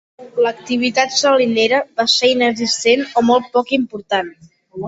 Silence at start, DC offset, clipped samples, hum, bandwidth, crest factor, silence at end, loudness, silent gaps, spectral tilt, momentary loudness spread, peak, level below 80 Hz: 0.2 s; under 0.1%; under 0.1%; none; 8 kHz; 16 dB; 0 s; -15 LUFS; none; -2.5 dB/octave; 7 LU; -2 dBFS; -60 dBFS